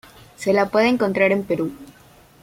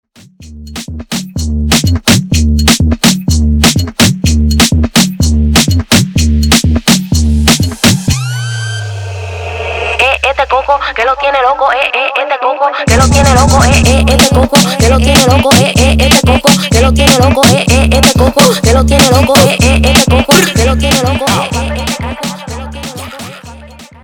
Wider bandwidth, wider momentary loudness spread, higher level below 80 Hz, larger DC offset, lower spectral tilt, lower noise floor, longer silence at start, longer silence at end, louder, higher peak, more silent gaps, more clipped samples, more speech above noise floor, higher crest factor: second, 16.5 kHz vs over 20 kHz; second, 9 LU vs 13 LU; second, -56 dBFS vs -18 dBFS; neither; first, -6 dB/octave vs -4 dB/octave; first, -50 dBFS vs -34 dBFS; about the same, 0.4 s vs 0.4 s; first, 0.55 s vs 0.15 s; second, -20 LUFS vs -8 LUFS; second, -4 dBFS vs 0 dBFS; neither; second, under 0.1% vs 0.2%; about the same, 31 dB vs 28 dB; first, 18 dB vs 8 dB